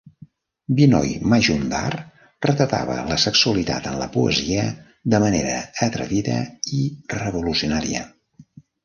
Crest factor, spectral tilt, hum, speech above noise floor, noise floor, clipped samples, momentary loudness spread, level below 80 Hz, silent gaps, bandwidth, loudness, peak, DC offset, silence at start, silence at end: 20 dB; -5 dB/octave; none; 28 dB; -49 dBFS; under 0.1%; 11 LU; -44 dBFS; none; 10 kHz; -21 LUFS; -2 dBFS; under 0.1%; 0.7 s; 0.45 s